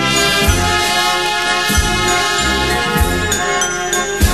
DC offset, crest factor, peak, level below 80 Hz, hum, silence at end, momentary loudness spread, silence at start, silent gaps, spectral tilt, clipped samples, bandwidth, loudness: 1%; 14 dB; 0 dBFS; -24 dBFS; none; 0 s; 3 LU; 0 s; none; -2.5 dB/octave; under 0.1%; 13 kHz; -14 LUFS